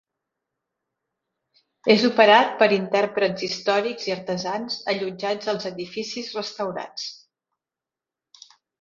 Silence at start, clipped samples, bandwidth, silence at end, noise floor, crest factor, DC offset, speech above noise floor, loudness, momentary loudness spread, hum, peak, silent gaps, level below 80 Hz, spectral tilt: 1.85 s; under 0.1%; 7.6 kHz; 1.65 s; -89 dBFS; 24 dB; under 0.1%; 67 dB; -22 LUFS; 15 LU; none; 0 dBFS; none; -70 dBFS; -4 dB/octave